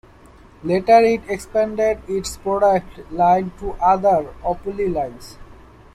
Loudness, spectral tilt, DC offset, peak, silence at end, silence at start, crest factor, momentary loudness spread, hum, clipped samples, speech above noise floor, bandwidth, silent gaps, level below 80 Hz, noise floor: -19 LUFS; -5.5 dB/octave; under 0.1%; -2 dBFS; 0.4 s; 0.65 s; 18 dB; 12 LU; none; under 0.1%; 28 dB; 14 kHz; none; -42 dBFS; -46 dBFS